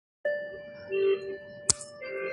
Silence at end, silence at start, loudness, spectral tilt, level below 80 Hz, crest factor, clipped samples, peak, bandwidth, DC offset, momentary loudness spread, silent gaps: 0 s; 0.25 s; -30 LUFS; -2 dB/octave; -60 dBFS; 30 dB; under 0.1%; -2 dBFS; 11.5 kHz; under 0.1%; 13 LU; none